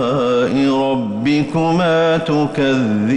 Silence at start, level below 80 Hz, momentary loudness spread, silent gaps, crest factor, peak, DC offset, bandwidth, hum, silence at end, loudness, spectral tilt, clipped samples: 0 s; -48 dBFS; 3 LU; none; 8 dB; -6 dBFS; under 0.1%; 10.5 kHz; none; 0 s; -16 LUFS; -7 dB/octave; under 0.1%